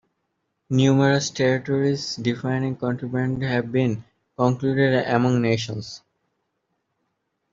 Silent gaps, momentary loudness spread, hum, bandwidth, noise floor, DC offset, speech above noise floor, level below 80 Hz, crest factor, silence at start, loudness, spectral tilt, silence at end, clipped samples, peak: none; 8 LU; none; 7.6 kHz; -75 dBFS; under 0.1%; 54 dB; -60 dBFS; 20 dB; 0.7 s; -22 LUFS; -6 dB/octave; 1.55 s; under 0.1%; -4 dBFS